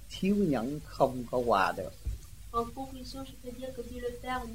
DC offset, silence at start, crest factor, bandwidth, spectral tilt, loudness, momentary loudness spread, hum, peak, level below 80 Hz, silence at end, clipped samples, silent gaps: 0.3%; 0 s; 20 dB; 16 kHz; -6 dB/octave; -33 LUFS; 15 LU; none; -12 dBFS; -48 dBFS; 0 s; under 0.1%; none